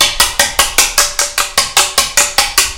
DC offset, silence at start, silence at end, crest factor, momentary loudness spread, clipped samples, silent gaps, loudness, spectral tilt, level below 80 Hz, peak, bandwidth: under 0.1%; 0 s; 0 s; 12 dB; 3 LU; 0.6%; none; -10 LUFS; 1 dB/octave; -32 dBFS; 0 dBFS; over 20 kHz